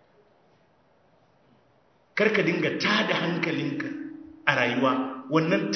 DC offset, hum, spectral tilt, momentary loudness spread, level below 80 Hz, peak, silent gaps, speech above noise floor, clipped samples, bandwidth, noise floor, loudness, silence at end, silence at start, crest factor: under 0.1%; none; -5.5 dB/octave; 11 LU; -72 dBFS; -2 dBFS; none; 38 dB; under 0.1%; 6.4 kHz; -63 dBFS; -25 LUFS; 0 s; 2.15 s; 24 dB